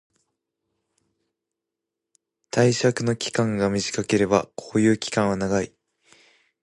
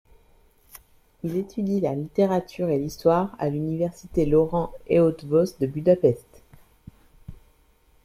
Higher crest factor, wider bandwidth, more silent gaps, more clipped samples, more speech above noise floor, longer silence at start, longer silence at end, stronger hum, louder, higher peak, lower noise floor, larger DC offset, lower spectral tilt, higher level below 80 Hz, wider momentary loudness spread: about the same, 22 dB vs 18 dB; second, 11.5 kHz vs 15 kHz; neither; neither; first, 63 dB vs 37 dB; first, 2.55 s vs 1.25 s; first, 1 s vs 0.7 s; neither; about the same, -23 LUFS vs -24 LUFS; about the same, -4 dBFS vs -6 dBFS; first, -85 dBFS vs -60 dBFS; neither; second, -5 dB/octave vs -8 dB/octave; second, -54 dBFS vs -48 dBFS; about the same, 6 LU vs 8 LU